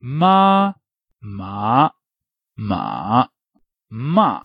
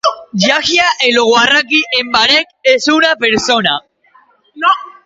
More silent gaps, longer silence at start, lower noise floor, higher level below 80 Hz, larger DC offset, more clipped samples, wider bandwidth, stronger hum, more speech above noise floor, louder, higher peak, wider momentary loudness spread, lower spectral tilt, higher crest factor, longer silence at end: neither; about the same, 0.05 s vs 0.05 s; first, -85 dBFS vs -50 dBFS; about the same, -56 dBFS vs -52 dBFS; neither; neither; second, 5.4 kHz vs 8 kHz; neither; first, 68 dB vs 38 dB; second, -18 LUFS vs -11 LUFS; about the same, -2 dBFS vs 0 dBFS; first, 18 LU vs 5 LU; first, -9 dB/octave vs -2.5 dB/octave; about the same, 16 dB vs 12 dB; about the same, 0.05 s vs 0.15 s